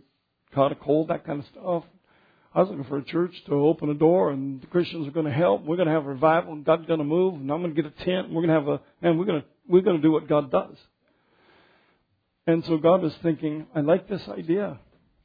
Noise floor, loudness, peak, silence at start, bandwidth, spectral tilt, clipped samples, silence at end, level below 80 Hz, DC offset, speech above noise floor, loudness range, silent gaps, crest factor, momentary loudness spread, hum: -72 dBFS; -24 LUFS; -6 dBFS; 0.55 s; 5 kHz; -10 dB/octave; under 0.1%; 0.45 s; -64 dBFS; under 0.1%; 48 dB; 3 LU; none; 18 dB; 9 LU; none